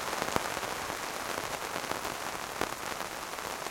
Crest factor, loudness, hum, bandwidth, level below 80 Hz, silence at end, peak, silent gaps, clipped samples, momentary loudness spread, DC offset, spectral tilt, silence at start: 30 dB; -35 LUFS; none; 17 kHz; -60 dBFS; 0 s; -6 dBFS; none; under 0.1%; 5 LU; under 0.1%; -2 dB/octave; 0 s